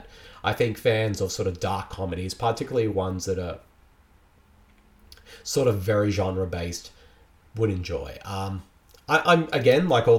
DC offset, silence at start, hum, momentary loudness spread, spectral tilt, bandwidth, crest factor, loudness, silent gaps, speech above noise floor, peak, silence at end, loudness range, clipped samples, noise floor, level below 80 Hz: under 0.1%; 0 s; none; 14 LU; -5.5 dB/octave; 16.5 kHz; 20 dB; -25 LUFS; none; 33 dB; -6 dBFS; 0 s; 5 LU; under 0.1%; -57 dBFS; -50 dBFS